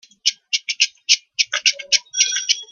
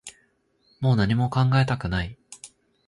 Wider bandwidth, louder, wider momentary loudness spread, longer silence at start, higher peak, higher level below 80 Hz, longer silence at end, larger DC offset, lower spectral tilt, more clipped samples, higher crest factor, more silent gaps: first, 14 kHz vs 11.5 kHz; first, -18 LUFS vs -23 LUFS; second, 6 LU vs 22 LU; first, 0.25 s vs 0.05 s; first, 0 dBFS vs -8 dBFS; second, -76 dBFS vs -44 dBFS; second, 0.1 s vs 0.4 s; neither; second, 6.5 dB/octave vs -6.5 dB/octave; neither; about the same, 20 dB vs 16 dB; neither